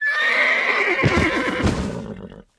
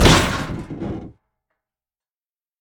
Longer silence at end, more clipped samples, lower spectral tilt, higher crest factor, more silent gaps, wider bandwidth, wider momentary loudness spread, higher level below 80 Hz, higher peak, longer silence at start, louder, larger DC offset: second, 0.15 s vs 1.5 s; neither; about the same, -5 dB/octave vs -4.5 dB/octave; second, 16 dB vs 22 dB; neither; second, 11 kHz vs over 20 kHz; about the same, 16 LU vs 16 LU; second, -36 dBFS vs -30 dBFS; second, -6 dBFS vs 0 dBFS; about the same, 0 s vs 0 s; first, -18 LUFS vs -21 LUFS; neither